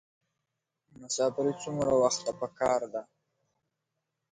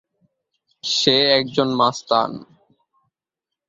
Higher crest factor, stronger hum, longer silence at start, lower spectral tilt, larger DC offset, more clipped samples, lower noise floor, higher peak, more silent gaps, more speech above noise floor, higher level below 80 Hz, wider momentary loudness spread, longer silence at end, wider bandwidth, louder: about the same, 20 dB vs 20 dB; neither; first, 1 s vs 0.85 s; about the same, -4 dB/octave vs -3.5 dB/octave; neither; neither; about the same, -85 dBFS vs -86 dBFS; second, -12 dBFS vs -2 dBFS; neither; second, 56 dB vs 67 dB; about the same, -66 dBFS vs -62 dBFS; second, 10 LU vs 13 LU; about the same, 1.3 s vs 1.25 s; first, 10.5 kHz vs 7.8 kHz; second, -30 LUFS vs -18 LUFS